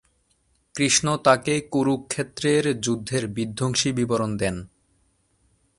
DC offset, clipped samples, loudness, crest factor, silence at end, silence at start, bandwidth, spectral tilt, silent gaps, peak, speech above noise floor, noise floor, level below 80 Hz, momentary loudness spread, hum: under 0.1%; under 0.1%; -23 LUFS; 22 dB; 1.15 s; 0.75 s; 11.5 kHz; -4 dB/octave; none; -2 dBFS; 44 dB; -67 dBFS; -54 dBFS; 9 LU; none